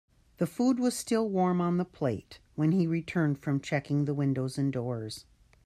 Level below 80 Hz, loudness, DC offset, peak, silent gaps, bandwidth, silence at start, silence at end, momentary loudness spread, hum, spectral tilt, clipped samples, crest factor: -64 dBFS; -30 LUFS; under 0.1%; -14 dBFS; none; 14.5 kHz; 0.4 s; 0.45 s; 8 LU; none; -6.5 dB/octave; under 0.1%; 16 dB